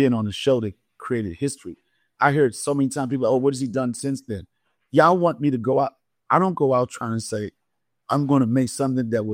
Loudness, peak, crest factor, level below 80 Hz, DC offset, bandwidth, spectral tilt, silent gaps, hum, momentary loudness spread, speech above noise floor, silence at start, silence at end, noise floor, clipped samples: -22 LUFS; -2 dBFS; 20 dB; -58 dBFS; under 0.1%; 16 kHz; -6 dB/octave; none; none; 11 LU; 52 dB; 0 s; 0 s; -73 dBFS; under 0.1%